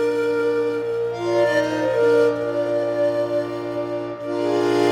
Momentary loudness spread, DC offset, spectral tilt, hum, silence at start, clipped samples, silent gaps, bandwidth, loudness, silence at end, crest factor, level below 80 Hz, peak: 9 LU; under 0.1%; -6 dB/octave; none; 0 s; under 0.1%; none; 13 kHz; -21 LUFS; 0 s; 14 dB; -62 dBFS; -6 dBFS